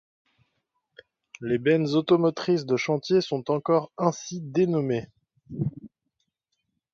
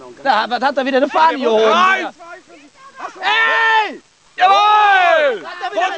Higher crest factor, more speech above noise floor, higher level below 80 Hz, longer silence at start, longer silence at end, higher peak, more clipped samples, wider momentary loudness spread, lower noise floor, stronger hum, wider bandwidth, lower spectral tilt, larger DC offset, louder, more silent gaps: first, 20 dB vs 14 dB; first, 55 dB vs 28 dB; about the same, -64 dBFS vs -68 dBFS; first, 1.4 s vs 0 s; first, 1.05 s vs 0 s; second, -6 dBFS vs -2 dBFS; neither; second, 10 LU vs 13 LU; first, -79 dBFS vs -42 dBFS; neither; about the same, 7.4 kHz vs 8 kHz; first, -6.5 dB/octave vs -2.5 dB/octave; second, under 0.1% vs 0.1%; second, -25 LUFS vs -14 LUFS; neither